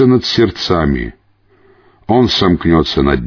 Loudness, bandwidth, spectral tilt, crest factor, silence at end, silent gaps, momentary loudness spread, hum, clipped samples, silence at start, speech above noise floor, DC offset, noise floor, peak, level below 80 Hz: -13 LUFS; 5.4 kHz; -6.5 dB/octave; 12 dB; 0 s; none; 9 LU; none; under 0.1%; 0 s; 39 dB; under 0.1%; -51 dBFS; 0 dBFS; -28 dBFS